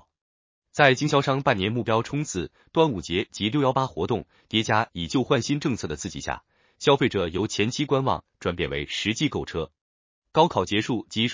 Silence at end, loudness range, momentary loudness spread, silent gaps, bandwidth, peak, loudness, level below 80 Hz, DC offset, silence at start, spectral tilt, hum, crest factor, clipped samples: 0 s; 3 LU; 10 LU; 9.81-10.22 s; 7.6 kHz; -2 dBFS; -25 LUFS; -48 dBFS; under 0.1%; 0.75 s; -5 dB/octave; none; 24 dB; under 0.1%